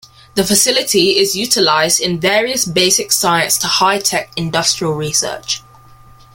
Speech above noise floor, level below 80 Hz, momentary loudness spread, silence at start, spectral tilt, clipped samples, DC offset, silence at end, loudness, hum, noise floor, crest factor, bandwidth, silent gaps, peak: 27 dB; -50 dBFS; 8 LU; 0.35 s; -2 dB/octave; under 0.1%; under 0.1%; 0.75 s; -13 LUFS; none; -42 dBFS; 16 dB; 17 kHz; none; 0 dBFS